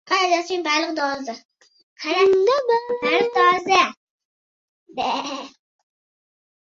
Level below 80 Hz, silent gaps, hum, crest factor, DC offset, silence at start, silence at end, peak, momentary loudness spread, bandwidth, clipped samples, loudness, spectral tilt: -66 dBFS; 1.45-1.49 s, 1.83-1.96 s, 3.97-4.18 s, 4.25-4.86 s; none; 20 dB; under 0.1%; 0.05 s; 1.15 s; -2 dBFS; 16 LU; 7.6 kHz; under 0.1%; -20 LUFS; -2.5 dB/octave